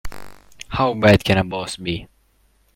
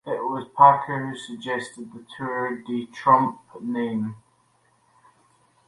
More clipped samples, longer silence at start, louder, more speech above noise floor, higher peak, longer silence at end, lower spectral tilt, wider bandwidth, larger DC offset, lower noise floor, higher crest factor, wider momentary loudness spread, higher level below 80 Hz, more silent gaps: neither; about the same, 0.05 s vs 0.05 s; first, -19 LUFS vs -23 LUFS; about the same, 42 dB vs 41 dB; about the same, 0 dBFS vs -2 dBFS; second, 0.7 s vs 1.5 s; about the same, -6 dB/octave vs -6 dB/octave; first, 16.5 kHz vs 11.5 kHz; neither; second, -59 dBFS vs -64 dBFS; about the same, 20 dB vs 22 dB; about the same, 18 LU vs 18 LU; first, -40 dBFS vs -70 dBFS; neither